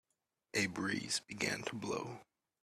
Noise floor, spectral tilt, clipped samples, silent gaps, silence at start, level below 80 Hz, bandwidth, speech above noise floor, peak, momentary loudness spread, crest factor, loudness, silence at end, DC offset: -87 dBFS; -3 dB/octave; under 0.1%; none; 0.55 s; -74 dBFS; 14.5 kHz; 47 dB; -20 dBFS; 7 LU; 20 dB; -38 LUFS; 0.4 s; under 0.1%